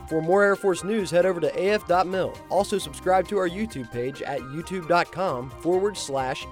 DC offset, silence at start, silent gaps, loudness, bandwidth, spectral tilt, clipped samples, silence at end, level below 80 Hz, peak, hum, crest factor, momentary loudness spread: under 0.1%; 0 s; none; -25 LUFS; 16.5 kHz; -5 dB/octave; under 0.1%; 0 s; -50 dBFS; -8 dBFS; none; 16 dB; 10 LU